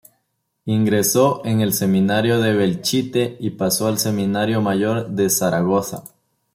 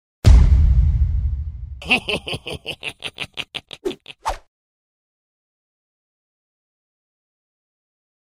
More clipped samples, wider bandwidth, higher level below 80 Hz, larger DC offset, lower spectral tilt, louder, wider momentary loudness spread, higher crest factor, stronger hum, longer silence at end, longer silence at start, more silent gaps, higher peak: neither; first, 16.5 kHz vs 11.5 kHz; second, -58 dBFS vs -22 dBFS; neither; about the same, -5 dB/octave vs -5.5 dB/octave; about the same, -19 LUFS vs -20 LUFS; second, 6 LU vs 16 LU; about the same, 16 dB vs 20 dB; neither; second, 0.45 s vs 3.9 s; first, 0.65 s vs 0.25 s; neither; second, -4 dBFS vs 0 dBFS